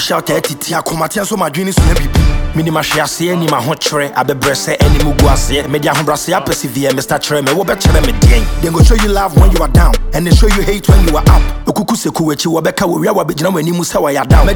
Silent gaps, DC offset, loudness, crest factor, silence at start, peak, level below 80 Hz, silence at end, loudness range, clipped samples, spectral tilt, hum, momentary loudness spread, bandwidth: none; under 0.1%; -12 LUFS; 10 dB; 0 s; 0 dBFS; -14 dBFS; 0 s; 3 LU; under 0.1%; -5 dB/octave; none; 6 LU; 20 kHz